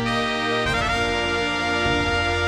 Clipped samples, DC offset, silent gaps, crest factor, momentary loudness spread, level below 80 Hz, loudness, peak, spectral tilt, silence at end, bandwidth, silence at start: under 0.1%; under 0.1%; none; 14 dB; 1 LU; -38 dBFS; -21 LUFS; -8 dBFS; -4 dB/octave; 0 s; 14 kHz; 0 s